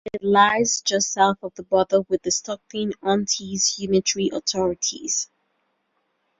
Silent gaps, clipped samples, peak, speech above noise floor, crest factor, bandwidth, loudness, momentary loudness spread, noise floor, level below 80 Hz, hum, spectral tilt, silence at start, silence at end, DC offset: none; under 0.1%; -4 dBFS; 50 dB; 18 dB; 7.8 kHz; -21 LUFS; 9 LU; -72 dBFS; -58 dBFS; none; -2.5 dB/octave; 0.05 s; 1.15 s; under 0.1%